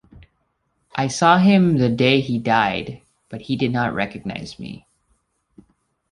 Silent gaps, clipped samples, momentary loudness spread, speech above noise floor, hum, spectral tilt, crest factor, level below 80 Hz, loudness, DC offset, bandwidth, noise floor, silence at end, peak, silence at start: none; under 0.1%; 21 LU; 51 dB; none; -6 dB/octave; 18 dB; -52 dBFS; -18 LUFS; under 0.1%; 11 kHz; -69 dBFS; 1.35 s; -2 dBFS; 0.95 s